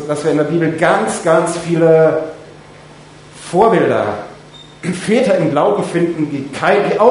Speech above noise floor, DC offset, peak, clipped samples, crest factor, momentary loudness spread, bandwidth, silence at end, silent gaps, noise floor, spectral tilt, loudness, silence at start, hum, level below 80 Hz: 25 dB; under 0.1%; 0 dBFS; under 0.1%; 14 dB; 11 LU; 11 kHz; 0 s; none; -38 dBFS; -6 dB/octave; -14 LUFS; 0 s; none; -54 dBFS